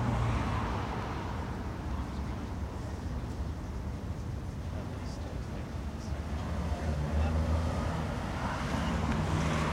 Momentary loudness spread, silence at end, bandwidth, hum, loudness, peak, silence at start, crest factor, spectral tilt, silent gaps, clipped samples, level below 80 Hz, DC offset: 8 LU; 0 s; 12.5 kHz; none; -35 LUFS; -18 dBFS; 0 s; 14 dB; -6.5 dB/octave; none; under 0.1%; -38 dBFS; under 0.1%